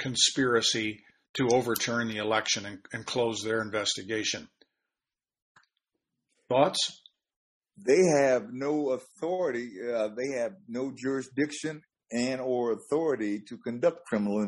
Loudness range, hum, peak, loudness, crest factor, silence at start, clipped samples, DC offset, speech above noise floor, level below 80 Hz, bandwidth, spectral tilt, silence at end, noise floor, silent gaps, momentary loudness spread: 5 LU; none; -8 dBFS; -29 LUFS; 22 dB; 0 s; under 0.1%; under 0.1%; over 61 dB; -70 dBFS; 11.5 kHz; -3.5 dB/octave; 0 s; under -90 dBFS; 1.29-1.34 s, 5.42-5.55 s, 7.36-7.61 s; 12 LU